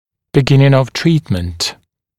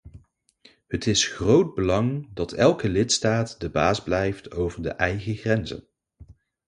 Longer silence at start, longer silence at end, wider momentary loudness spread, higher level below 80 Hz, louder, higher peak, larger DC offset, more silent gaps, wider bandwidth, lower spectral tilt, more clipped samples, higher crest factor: first, 0.35 s vs 0.05 s; about the same, 0.45 s vs 0.35 s; about the same, 10 LU vs 9 LU; about the same, -40 dBFS vs -44 dBFS; first, -14 LUFS vs -24 LUFS; first, 0 dBFS vs -4 dBFS; neither; neither; first, 13 kHz vs 11 kHz; first, -6 dB/octave vs -4.5 dB/octave; neither; second, 14 dB vs 20 dB